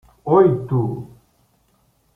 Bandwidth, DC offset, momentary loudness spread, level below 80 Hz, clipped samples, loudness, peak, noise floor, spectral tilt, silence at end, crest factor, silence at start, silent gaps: 3.6 kHz; under 0.1%; 12 LU; -52 dBFS; under 0.1%; -18 LUFS; -2 dBFS; -62 dBFS; -11 dB/octave; 1.1 s; 18 dB; 0.25 s; none